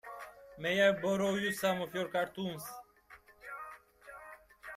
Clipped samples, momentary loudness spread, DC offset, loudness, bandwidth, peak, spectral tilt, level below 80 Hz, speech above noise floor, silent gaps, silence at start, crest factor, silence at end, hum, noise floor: under 0.1%; 23 LU; under 0.1%; -33 LUFS; 16 kHz; -16 dBFS; -4.5 dB/octave; -70 dBFS; 27 dB; none; 0.05 s; 20 dB; 0 s; none; -60 dBFS